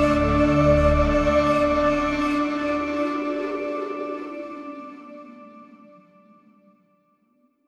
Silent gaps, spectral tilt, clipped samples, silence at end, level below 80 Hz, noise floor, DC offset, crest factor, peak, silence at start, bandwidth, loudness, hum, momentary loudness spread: none; -7 dB/octave; under 0.1%; 1.95 s; -34 dBFS; -65 dBFS; under 0.1%; 18 dB; -6 dBFS; 0 s; 10.5 kHz; -22 LUFS; none; 20 LU